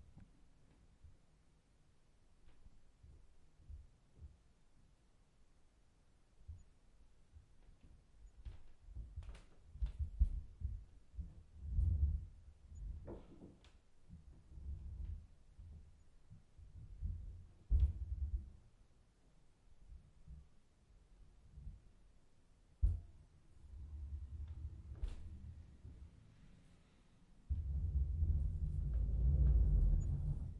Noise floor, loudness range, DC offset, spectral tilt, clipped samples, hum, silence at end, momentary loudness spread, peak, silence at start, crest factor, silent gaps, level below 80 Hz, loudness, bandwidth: -70 dBFS; 22 LU; under 0.1%; -9 dB/octave; under 0.1%; none; 0 s; 24 LU; -22 dBFS; 0.1 s; 20 dB; none; -44 dBFS; -43 LUFS; 3.7 kHz